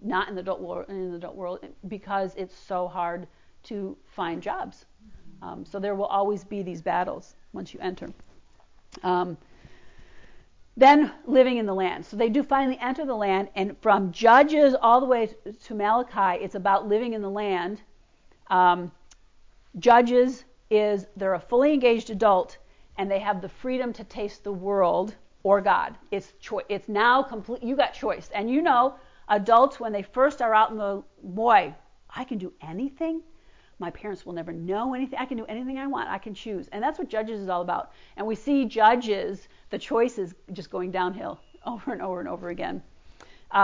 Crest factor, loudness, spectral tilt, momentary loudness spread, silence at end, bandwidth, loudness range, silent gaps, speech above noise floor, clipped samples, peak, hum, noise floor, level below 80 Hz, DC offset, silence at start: 20 dB; -25 LUFS; -6 dB/octave; 17 LU; 0 s; 7.6 kHz; 11 LU; none; 32 dB; under 0.1%; -6 dBFS; none; -57 dBFS; -58 dBFS; under 0.1%; 0 s